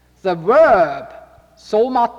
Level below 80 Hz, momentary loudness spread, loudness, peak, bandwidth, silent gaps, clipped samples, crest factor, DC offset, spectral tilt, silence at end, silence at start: -50 dBFS; 11 LU; -15 LUFS; -4 dBFS; 7.8 kHz; none; under 0.1%; 14 dB; under 0.1%; -6.5 dB/octave; 0 s; 0.25 s